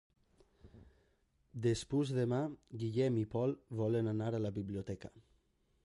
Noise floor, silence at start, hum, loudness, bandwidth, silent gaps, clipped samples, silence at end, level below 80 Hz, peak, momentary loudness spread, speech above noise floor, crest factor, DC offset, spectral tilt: -75 dBFS; 0.65 s; none; -37 LUFS; 11.5 kHz; none; under 0.1%; 0.65 s; -64 dBFS; -22 dBFS; 9 LU; 39 dB; 16 dB; under 0.1%; -7.5 dB/octave